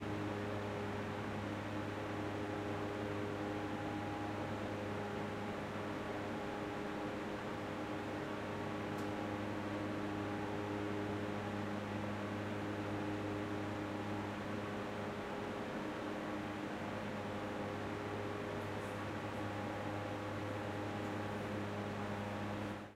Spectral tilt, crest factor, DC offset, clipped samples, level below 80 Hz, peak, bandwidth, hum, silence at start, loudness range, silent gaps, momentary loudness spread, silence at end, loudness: -6.5 dB/octave; 14 dB; under 0.1%; under 0.1%; -64 dBFS; -28 dBFS; 15.5 kHz; none; 0 s; 1 LU; none; 2 LU; 0 s; -42 LUFS